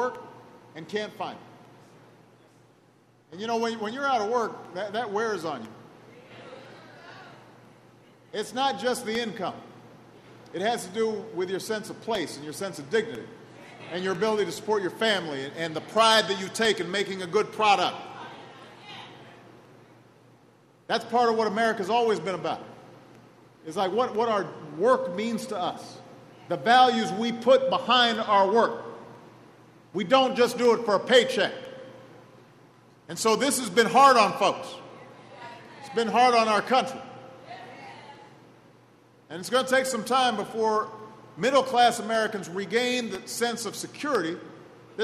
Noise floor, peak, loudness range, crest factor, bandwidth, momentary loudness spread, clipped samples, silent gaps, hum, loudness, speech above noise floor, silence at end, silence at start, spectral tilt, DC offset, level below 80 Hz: -60 dBFS; -6 dBFS; 9 LU; 22 dB; 13.5 kHz; 24 LU; under 0.1%; none; none; -25 LUFS; 35 dB; 0 s; 0 s; -3.5 dB/octave; under 0.1%; -74 dBFS